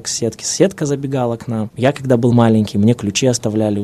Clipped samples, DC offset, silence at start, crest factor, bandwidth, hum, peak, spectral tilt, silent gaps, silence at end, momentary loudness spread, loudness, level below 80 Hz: under 0.1%; under 0.1%; 0 s; 16 dB; 13.5 kHz; none; 0 dBFS; -5.5 dB/octave; none; 0 s; 8 LU; -16 LUFS; -52 dBFS